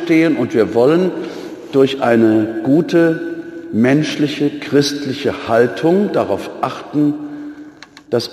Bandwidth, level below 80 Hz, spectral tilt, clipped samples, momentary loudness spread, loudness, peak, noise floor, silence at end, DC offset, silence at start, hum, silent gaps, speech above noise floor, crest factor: 13.5 kHz; -58 dBFS; -6 dB/octave; under 0.1%; 13 LU; -15 LUFS; -2 dBFS; -39 dBFS; 0 s; under 0.1%; 0 s; none; none; 24 dB; 14 dB